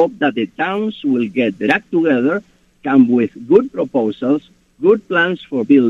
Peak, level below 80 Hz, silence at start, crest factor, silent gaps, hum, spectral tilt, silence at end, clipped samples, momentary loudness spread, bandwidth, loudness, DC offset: 0 dBFS; -58 dBFS; 0 s; 16 dB; none; none; -7.5 dB/octave; 0 s; under 0.1%; 6 LU; 7 kHz; -16 LUFS; under 0.1%